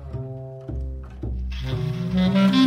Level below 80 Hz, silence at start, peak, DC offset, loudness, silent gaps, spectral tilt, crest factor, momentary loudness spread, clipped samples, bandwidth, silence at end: -34 dBFS; 0 s; -6 dBFS; under 0.1%; -26 LUFS; none; -7.5 dB/octave; 16 dB; 16 LU; under 0.1%; 9.4 kHz; 0 s